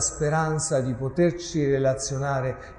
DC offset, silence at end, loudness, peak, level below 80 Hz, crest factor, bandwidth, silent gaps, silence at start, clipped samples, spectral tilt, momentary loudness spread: under 0.1%; 0 s; -25 LUFS; -12 dBFS; -46 dBFS; 14 dB; 11.5 kHz; none; 0 s; under 0.1%; -5 dB/octave; 4 LU